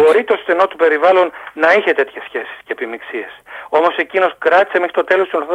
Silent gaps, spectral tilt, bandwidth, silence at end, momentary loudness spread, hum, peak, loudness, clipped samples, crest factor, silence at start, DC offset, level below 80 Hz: none; -4 dB/octave; 11.5 kHz; 0 s; 14 LU; none; -2 dBFS; -15 LUFS; under 0.1%; 14 dB; 0 s; under 0.1%; -64 dBFS